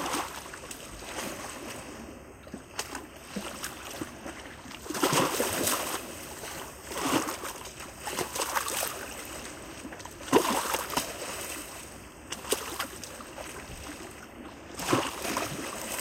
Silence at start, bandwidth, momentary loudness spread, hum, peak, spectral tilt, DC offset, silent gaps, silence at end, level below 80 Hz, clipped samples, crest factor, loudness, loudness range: 0 s; 16.5 kHz; 15 LU; none; -8 dBFS; -2.5 dB/octave; under 0.1%; none; 0 s; -56 dBFS; under 0.1%; 26 dB; -33 LUFS; 9 LU